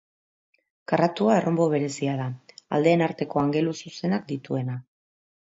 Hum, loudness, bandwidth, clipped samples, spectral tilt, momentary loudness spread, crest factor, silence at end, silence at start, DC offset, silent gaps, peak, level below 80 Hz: none; -25 LUFS; 8 kHz; under 0.1%; -6.5 dB/octave; 12 LU; 18 dB; 0.75 s; 0.9 s; under 0.1%; none; -6 dBFS; -66 dBFS